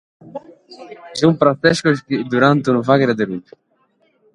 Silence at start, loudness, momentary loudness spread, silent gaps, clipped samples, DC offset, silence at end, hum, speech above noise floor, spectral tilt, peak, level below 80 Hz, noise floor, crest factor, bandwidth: 0.25 s; -16 LUFS; 21 LU; none; under 0.1%; under 0.1%; 0.95 s; none; 45 dB; -6 dB/octave; 0 dBFS; -56 dBFS; -61 dBFS; 18 dB; 11.5 kHz